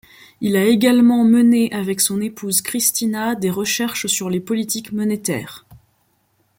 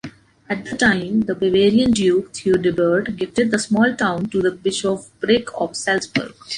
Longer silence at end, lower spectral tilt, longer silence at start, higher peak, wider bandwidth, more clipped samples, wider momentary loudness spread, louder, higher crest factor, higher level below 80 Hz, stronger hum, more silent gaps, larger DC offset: first, 0.85 s vs 0 s; about the same, -4 dB/octave vs -4.5 dB/octave; first, 0.4 s vs 0.05 s; about the same, -2 dBFS vs -2 dBFS; first, 17 kHz vs 11 kHz; neither; about the same, 10 LU vs 9 LU; about the same, -17 LUFS vs -19 LUFS; about the same, 16 dB vs 16 dB; second, -60 dBFS vs -50 dBFS; neither; neither; neither